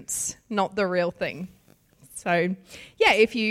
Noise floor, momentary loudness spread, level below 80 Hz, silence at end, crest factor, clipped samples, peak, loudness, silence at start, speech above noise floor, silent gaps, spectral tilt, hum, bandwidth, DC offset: -57 dBFS; 20 LU; -60 dBFS; 0 s; 18 dB; under 0.1%; -8 dBFS; -24 LUFS; 0 s; 32 dB; none; -3.5 dB/octave; none; 16 kHz; under 0.1%